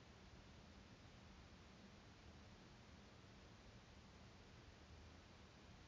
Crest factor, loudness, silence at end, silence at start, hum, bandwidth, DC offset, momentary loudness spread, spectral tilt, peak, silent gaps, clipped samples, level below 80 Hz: 14 dB; -64 LUFS; 0 s; 0 s; none; 7.2 kHz; under 0.1%; 1 LU; -4.5 dB/octave; -50 dBFS; none; under 0.1%; -70 dBFS